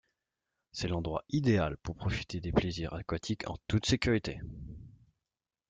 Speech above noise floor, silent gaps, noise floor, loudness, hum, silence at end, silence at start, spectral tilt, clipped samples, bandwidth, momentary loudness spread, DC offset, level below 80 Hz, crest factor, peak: over 57 dB; none; under -90 dBFS; -33 LUFS; none; 0.8 s; 0.75 s; -6 dB/octave; under 0.1%; 9.2 kHz; 16 LU; under 0.1%; -50 dBFS; 22 dB; -14 dBFS